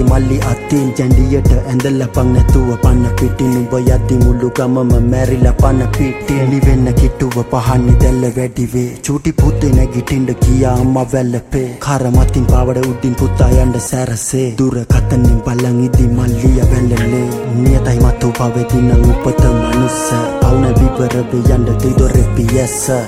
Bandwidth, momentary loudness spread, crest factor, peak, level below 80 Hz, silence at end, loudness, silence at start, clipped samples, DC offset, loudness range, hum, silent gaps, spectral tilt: 15.5 kHz; 5 LU; 10 dB; 0 dBFS; -16 dBFS; 0 s; -13 LUFS; 0 s; under 0.1%; under 0.1%; 1 LU; none; none; -7 dB/octave